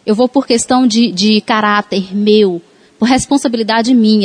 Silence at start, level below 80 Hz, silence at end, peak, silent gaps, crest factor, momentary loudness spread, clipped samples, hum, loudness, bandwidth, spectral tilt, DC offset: 0.05 s; -48 dBFS; 0 s; 0 dBFS; none; 12 dB; 5 LU; under 0.1%; none; -12 LUFS; 10.5 kHz; -4.5 dB/octave; under 0.1%